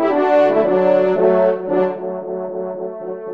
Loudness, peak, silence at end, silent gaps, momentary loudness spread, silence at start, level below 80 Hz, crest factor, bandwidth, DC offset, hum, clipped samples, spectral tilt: -17 LUFS; -2 dBFS; 0 s; none; 12 LU; 0 s; -66 dBFS; 14 dB; 5.8 kHz; 0.3%; none; under 0.1%; -8.5 dB/octave